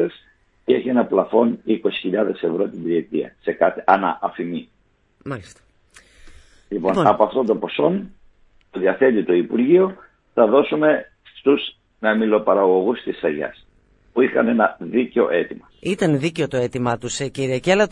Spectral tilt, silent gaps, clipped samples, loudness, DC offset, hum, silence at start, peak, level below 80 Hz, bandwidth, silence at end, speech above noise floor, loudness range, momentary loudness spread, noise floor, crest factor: -6 dB/octave; none; under 0.1%; -20 LUFS; under 0.1%; none; 0 s; 0 dBFS; -56 dBFS; 11.5 kHz; 0 s; 40 dB; 5 LU; 12 LU; -59 dBFS; 20 dB